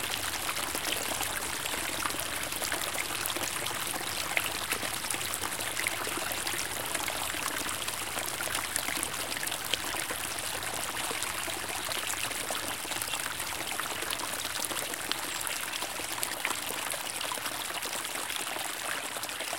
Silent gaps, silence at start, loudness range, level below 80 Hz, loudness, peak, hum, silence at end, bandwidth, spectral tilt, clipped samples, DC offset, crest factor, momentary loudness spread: none; 0 s; 1 LU; -58 dBFS; -32 LUFS; -6 dBFS; none; 0 s; 17 kHz; -0.5 dB/octave; under 0.1%; 0.3%; 28 dB; 2 LU